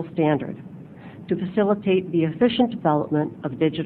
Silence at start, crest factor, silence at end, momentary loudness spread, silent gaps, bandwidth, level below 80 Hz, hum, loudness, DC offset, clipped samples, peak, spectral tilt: 0 s; 16 dB; 0 s; 19 LU; none; 4.5 kHz; -58 dBFS; none; -22 LUFS; under 0.1%; under 0.1%; -6 dBFS; -10 dB/octave